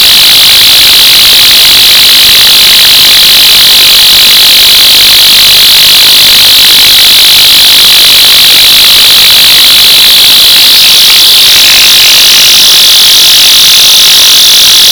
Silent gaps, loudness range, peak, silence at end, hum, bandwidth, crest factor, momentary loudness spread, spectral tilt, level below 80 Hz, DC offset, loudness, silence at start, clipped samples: none; 0 LU; 0 dBFS; 0 s; none; over 20 kHz; 2 dB; 0 LU; 1.5 dB/octave; -34 dBFS; 1%; 2 LUFS; 0 s; 30%